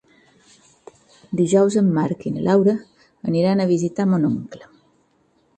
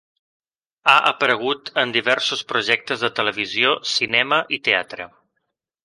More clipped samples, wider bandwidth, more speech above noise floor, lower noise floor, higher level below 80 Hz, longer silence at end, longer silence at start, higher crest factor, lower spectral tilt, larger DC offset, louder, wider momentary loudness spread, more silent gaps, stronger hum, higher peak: neither; second, 9 kHz vs 11.5 kHz; second, 43 dB vs 56 dB; second, -62 dBFS vs -76 dBFS; first, -60 dBFS vs -68 dBFS; first, 1 s vs 0.75 s; first, 1.3 s vs 0.85 s; about the same, 16 dB vs 20 dB; first, -7.5 dB/octave vs -2.5 dB/octave; neither; about the same, -19 LUFS vs -19 LUFS; first, 12 LU vs 7 LU; neither; neither; second, -6 dBFS vs -2 dBFS